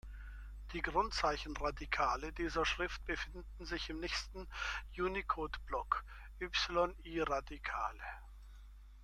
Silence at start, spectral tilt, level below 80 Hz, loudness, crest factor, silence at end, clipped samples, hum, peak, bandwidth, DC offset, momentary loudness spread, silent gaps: 0.05 s; -4 dB/octave; -50 dBFS; -39 LUFS; 20 dB; 0 s; under 0.1%; 50 Hz at -50 dBFS; -18 dBFS; 13.5 kHz; under 0.1%; 17 LU; none